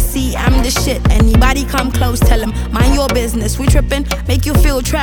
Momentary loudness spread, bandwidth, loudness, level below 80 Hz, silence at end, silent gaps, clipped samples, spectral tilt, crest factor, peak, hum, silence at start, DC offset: 5 LU; 19.5 kHz; -14 LUFS; -14 dBFS; 0 s; none; under 0.1%; -5 dB/octave; 12 dB; 0 dBFS; none; 0 s; under 0.1%